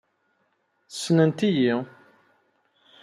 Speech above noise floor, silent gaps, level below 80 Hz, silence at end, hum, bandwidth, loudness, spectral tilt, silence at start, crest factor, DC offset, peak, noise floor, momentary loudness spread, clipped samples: 49 dB; none; -72 dBFS; 1.2 s; none; 13 kHz; -23 LUFS; -6 dB/octave; 0.9 s; 20 dB; under 0.1%; -8 dBFS; -70 dBFS; 17 LU; under 0.1%